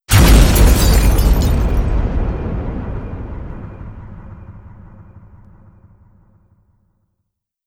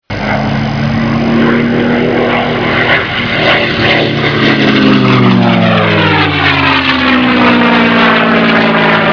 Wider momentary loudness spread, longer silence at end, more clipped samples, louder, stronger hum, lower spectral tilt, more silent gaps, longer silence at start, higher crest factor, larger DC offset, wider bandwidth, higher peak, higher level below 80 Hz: first, 25 LU vs 5 LU; first, 2.65 s vs 0 s; neither; second, -15 LUFS vs -8 LUFS; neither; second, -5 dB/octave vs -6.5 dB/octave; neither; about the same, 0.1 s vs 0.1 s; first, 16 dB vs 8 dB; second, under 0.1% vs 0.2%; first, 17.5 kHz vs 5.4 kHz; about the same, 0 dBFS vs 0 dBFS; first, -18 dBFS vs -34 dBFS